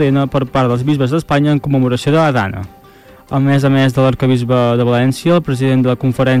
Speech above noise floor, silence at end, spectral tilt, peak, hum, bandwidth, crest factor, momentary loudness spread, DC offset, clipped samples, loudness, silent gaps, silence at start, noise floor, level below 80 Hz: 29 dB; 0 s; -7.5 dB/octave; -4 dBFS; none; 14.5 kHz; 8 dB; 4 LU; under 0.1%; under 0.1%; -14 LUFS; none; 0 s; -41 dBFS; -42 dBFS